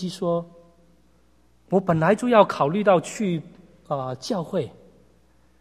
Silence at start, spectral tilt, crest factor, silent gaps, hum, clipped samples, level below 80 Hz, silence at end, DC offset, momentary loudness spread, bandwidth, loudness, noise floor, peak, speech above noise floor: 0 s; -6.5 dB/octave; 22 dB; none; none; under 0.1%; -60 dBFS; 0.9 s; under 0.1%; 13 LU; 14.5 kHz; -23 LUFS; -60 dBFS; -2 dBFS; 39 dB